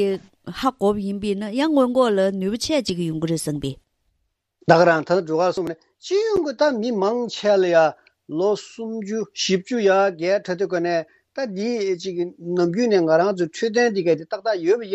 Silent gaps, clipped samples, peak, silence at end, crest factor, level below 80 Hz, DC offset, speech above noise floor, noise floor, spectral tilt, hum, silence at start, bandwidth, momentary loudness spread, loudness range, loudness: none; under 0.1%; -2 dBFS; 0 s; 20 dB; -56 dBFS; under 0.1%; 52 dB; -73 dBFS; -5 dB/octave; none; 0 s; 13.5 kHz; 11 LU; 2 LU; -21 LUFS